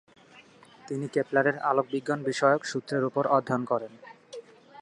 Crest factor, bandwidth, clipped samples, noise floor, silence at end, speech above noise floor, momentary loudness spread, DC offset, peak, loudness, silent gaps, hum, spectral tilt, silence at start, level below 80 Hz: 20 dB; 11 kHz; under 0.1%; -54 dBFS; 0 s; 28 dB; 20 LU; under 0.1%; -8 dBFS; -27 LUFS; none; none; -5.5 dB/octave; 0.35 s; -76 dBFS